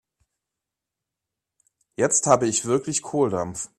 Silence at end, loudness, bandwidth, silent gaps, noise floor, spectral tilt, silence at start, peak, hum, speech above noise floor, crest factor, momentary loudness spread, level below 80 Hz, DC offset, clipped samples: 0.15 s; -22 LUFS; 13.5 kHz; none; -86 dBFS; -4 dB/octave; 2 s; -2 dBFS; none; 64 dB; 24 dB; 8 LU; -62 dBFS; under 0.1%; under 0.1%